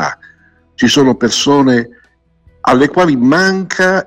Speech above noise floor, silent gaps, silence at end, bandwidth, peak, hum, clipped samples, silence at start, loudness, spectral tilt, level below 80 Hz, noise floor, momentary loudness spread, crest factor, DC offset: 40 dB; none; 0.05 s; 15 kHz; 0 dBFS; none; under 0.1%; 0 s; -11 LUFS; -4.5 dB/octave; -48 dBFS; -50 dBFS; 9 LU; 12 dB; under 0.1%